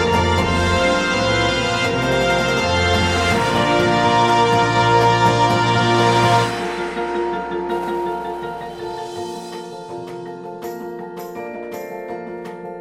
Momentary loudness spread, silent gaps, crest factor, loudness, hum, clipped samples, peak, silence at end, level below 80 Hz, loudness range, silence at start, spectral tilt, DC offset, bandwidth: 16 LU; none; 16 dB; -17 LUFS; none; under 0.1%; -2 dBFS; 0 s; -38 dBFS; 15 LU; 0 s; -5 dB/octave; under 0.1%; 15.5 kHz